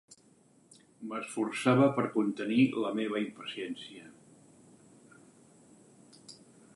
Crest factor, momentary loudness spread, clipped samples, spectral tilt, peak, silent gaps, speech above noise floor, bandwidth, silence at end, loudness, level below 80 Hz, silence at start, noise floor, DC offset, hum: 22 dB; 24 LU; under 0.1%; -6 dB/octave; -12 dBFS; none; 33 dB; 11.5 kHz; 0.4 s; -31 LUFS; -80 dBFS; 0.1 s; -64 dBFS; under 0.1%; none